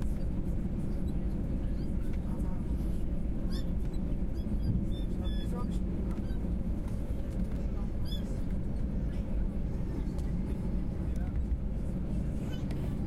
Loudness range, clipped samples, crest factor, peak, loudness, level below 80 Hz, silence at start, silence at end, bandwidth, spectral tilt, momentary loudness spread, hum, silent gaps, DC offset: 1 LU; under 0.1%; 12 dB; -20 dBFS; -36 LUFS; -34 dBFS; 0 s; 0 s; 12.5 kHz; -8.5 dB/octave; 2 LU; none; none; under 0.1%